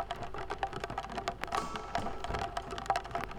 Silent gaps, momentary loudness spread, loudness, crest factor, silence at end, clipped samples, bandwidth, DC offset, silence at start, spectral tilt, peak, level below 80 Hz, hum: none; 5 LU; -38 LUFS; 22 dB; 0 s; under 0.1%; 19.5 kHz; under 0.1%; 0 s; -4 dB/octave; -14 dBFS; -50 dBFS; none